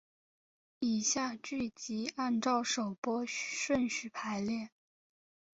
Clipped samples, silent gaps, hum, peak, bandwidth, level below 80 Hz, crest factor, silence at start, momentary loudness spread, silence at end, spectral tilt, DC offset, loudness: under 0.1%; 2.98-3.03 s; none; -18 dBFS; 8 kHz; -70 dBFS; 18 dB; 0.8 s; 7 LU; 0.9 s; -3 dB/octave; under 0.1%; -35 LUFS